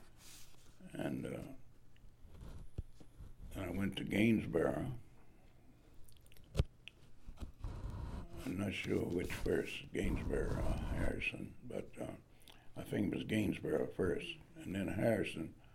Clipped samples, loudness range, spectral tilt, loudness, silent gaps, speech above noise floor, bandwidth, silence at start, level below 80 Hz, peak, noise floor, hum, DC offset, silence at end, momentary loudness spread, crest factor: under 0.1%; 9 LU; -6.5 dB/octave; -40 LUFS; none; 23 dB; 16.5 kHz; 0 s; -50 dBFS; -20 dBFS; -61 dBFS; none; under 0.1%; 0 s; 22 LU; 20 dB